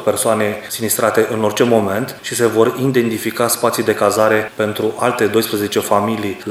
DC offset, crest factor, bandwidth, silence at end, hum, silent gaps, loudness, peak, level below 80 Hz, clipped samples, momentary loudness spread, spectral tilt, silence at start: under 0.1%; 16 dB; 16.5 kHz; 0 s; none; none; -16 LUFS; 0 dBFS; -60 dBFS; under 0.1%; 6 LU; -4 dB/octave; 0 s